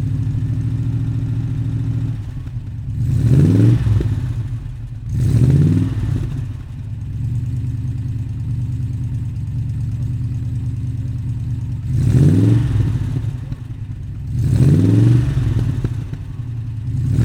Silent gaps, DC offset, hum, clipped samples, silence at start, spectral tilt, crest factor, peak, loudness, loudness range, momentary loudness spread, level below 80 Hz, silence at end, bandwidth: none; under 0.1%; none; under 0.1%; 0 s; -9 dB/octave; 16 dB; -2 dBFS; -19 LUFS; 7 LU; 15 LU; -30 dBFS; 0 s; 9.8 kHz